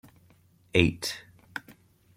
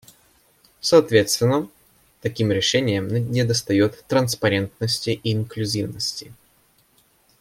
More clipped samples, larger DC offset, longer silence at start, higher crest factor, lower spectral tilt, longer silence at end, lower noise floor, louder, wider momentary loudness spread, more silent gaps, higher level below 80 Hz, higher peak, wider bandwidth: neither; neither; about the same, 0.75 s vs 0.85 s; first, 30 dB vs 20 dB; about the same, -5 dB/octave vs -4.5 dB/octave; second, 0.45 s vs 1.1 s; about the same, -61 dBFS vs -60 dBFS; second, -27 LUFS vs -21 LUFS; first, 17 LU vs 9 LU; neither; first, -52 dBFS vs -58 dBFS; about the same, -2 dBFS vs -2 dBFS; about the same, 16.5 kHz vs 16.5 kHz